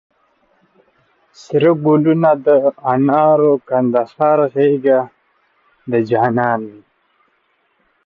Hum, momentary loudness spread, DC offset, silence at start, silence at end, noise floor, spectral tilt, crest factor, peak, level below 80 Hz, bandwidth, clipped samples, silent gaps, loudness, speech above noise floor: none; 8 LU; under 0.1%; 1.5 s; 1.35 s; -62 dBFS; -9 dB/octave; 14 dB; -2 dBFS; -62 dBFS; 7.2 kHz; under 0.1%; none; -14 LUFS; 48 dB